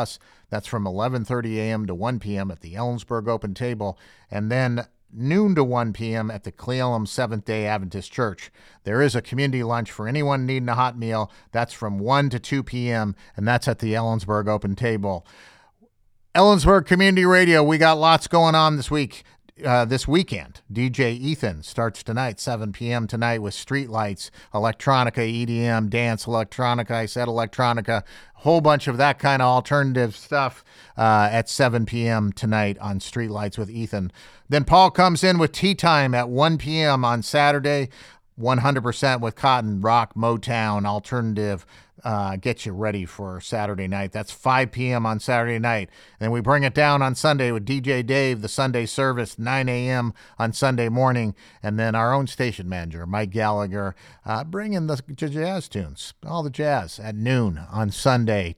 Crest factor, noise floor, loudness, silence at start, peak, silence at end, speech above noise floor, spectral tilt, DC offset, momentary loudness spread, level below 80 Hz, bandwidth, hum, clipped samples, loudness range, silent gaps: 20 dB; -59 dBFS; -22 LUFS; 0 s; -2 dBFS; 0.05 s; 37 dB; -6 dB/octave; under 0.1%; 12 LU; -46 dBFS; 14.5 kHz; none; under 0.1%; 8 LU; none